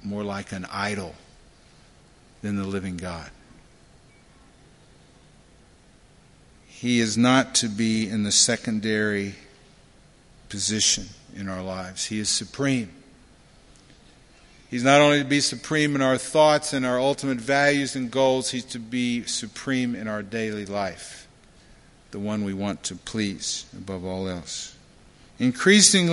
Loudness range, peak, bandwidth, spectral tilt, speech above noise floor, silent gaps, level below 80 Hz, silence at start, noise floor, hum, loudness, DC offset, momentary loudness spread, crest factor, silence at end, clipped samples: 13 LU; -2 dBFS; 11.5 kHz; -3 dB/octave; 31 dB; none; -54 dBFS; 0.05 s; -54 dBFS; none; -23 LUFS; under 0.1%; 16 LU; 24 dB; 0 s; under 0.1%